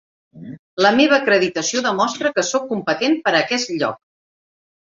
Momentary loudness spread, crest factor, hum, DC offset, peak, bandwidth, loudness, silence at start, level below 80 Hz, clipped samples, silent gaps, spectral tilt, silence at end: 12 LU; 18 dB; none; under 0.1%; -2 dBFS; 7.8 kHz; -18 LUFS; 0.35 s; -64 dBFS; under 0.1%; 0.59-0.77 s; -3 dB/octave; 0.9 s